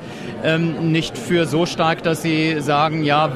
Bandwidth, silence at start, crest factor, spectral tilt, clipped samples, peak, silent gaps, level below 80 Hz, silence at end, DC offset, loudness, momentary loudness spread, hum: 14 kHz; 0 s; 14 dB; -5.5 dB/octave; under 0.1%; -4 dBFS; none; -52 dBFS; 0 s; under 0.1%; -19 LUFS; 3 LU; none